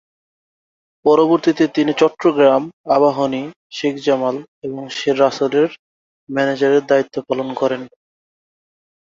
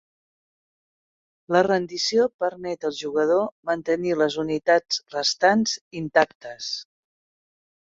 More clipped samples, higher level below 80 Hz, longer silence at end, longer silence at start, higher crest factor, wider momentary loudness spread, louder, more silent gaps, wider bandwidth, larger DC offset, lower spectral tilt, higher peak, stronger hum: neither; about the same, -64 dBFS vs -66 dBFS; first, 1.35 s vs 1.1 s; second, 1.05 s vs 1.5 s; about the same, 18 dB vs 22 dB; about the same, 12 LU vs 10 LU; first, -17 LUFS vs -23 LUFS; first, 2.73-2.84 s, 3.56-3.70 s, 4.48-4.62 s, 5.79-6.27 s vs 2.34-2.39 s, 3.52-3.63 s, 5.81-5.91 s, 6.35-6.40 s; about the same, 7.6 kHz vs 7.8 kHz; neither; first, -5.5 dB/octave vs -3.5 dB/octave; about the same, 0 dBFS vs -2 dBFS; neither